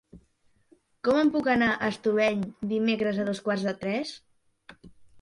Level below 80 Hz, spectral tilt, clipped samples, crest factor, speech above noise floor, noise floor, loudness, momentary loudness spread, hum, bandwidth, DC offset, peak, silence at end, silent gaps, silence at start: -62 dBFS; -6 dB/octave; under 0.1%; 18 dB; 40 dB; -66 dBFS; -26 LUFS; 8 LU; none; 11.5 kHz; under 0.1%; -10 dBFS; 0 s; none; 0.15 s